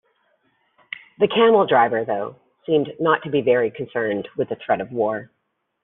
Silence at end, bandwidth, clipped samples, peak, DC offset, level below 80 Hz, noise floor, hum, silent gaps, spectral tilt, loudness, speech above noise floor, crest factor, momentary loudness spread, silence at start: 0.6 s; 3.9 kHz; under 0.1%; -4 dBFS; under 0.1%; -66 dBFS; -66 dBFS; none; none; -3.5 dB/octave; -20 LUFS; 46 dB; 18 dB; 17 LU; 1.2 s